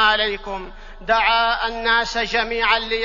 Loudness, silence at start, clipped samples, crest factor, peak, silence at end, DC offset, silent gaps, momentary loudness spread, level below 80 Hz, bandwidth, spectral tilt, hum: -19 LUFS; 0 s; under 0.1%; 16 dB; -4 dBFS; 0 s; under 0.1%; none; 15 LU; -38 dBFS; 7.4 kHz; -2 dB/octave; none